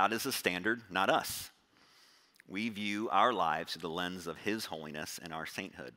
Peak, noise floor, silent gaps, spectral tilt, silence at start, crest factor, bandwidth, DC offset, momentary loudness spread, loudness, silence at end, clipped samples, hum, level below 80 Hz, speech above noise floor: -12 dBFS; -65 dBFS; none; -3 dB/octave; 0 s; 24 dB; 16 kHz; under 0.1%; 12 LU; -34 LUFS; 0.05 s; under 0.1%; none; -72 dBFS; 30 dB